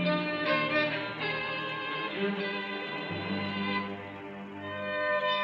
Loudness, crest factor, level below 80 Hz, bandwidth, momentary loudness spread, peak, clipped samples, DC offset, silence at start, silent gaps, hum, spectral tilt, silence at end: -31 LUFS; 18 dB; -72 dBFS; 7.2 kHz; 11 LU; -14 dBFS; under 0.1%; under 0.1%; 0 s; none; none; -7 dB/octave; 0 s